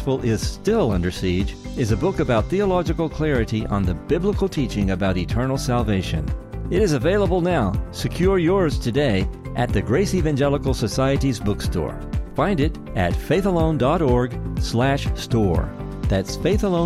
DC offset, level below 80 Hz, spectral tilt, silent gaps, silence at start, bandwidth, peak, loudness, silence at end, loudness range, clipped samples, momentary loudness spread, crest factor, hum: under 0.1%; -30 dBFS; -6.5 dB/octave; none; 0 s; 15.5 kHz; -6 dBFS; -21 LUFS; 0 s; 2 LU; under 0.1%; 6 LU; 14 dB; none